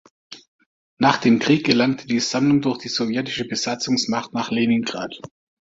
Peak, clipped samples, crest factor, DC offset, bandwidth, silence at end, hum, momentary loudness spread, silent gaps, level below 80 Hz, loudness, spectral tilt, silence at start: -2 dBFS; under 0.1%; 20 dB; under 0.1%; 7.8 kHz; 0.35 s; none; 8 LU; 0.48-0.59 s, 0.66-0.97 s; -60 dBFS; -20 LUFS; -4.5 dB/octave; 0.3 s